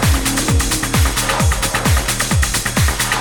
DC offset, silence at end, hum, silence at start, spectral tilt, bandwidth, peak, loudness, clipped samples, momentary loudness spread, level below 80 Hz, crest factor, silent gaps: under 0.1%; 0 s; none; 0 s; -3.5 dB/octave; 19.5 kHz; -4 dBFS; -16 LUFS; under 0.1%; 1 LU; -22 dBFS; 12 dB; none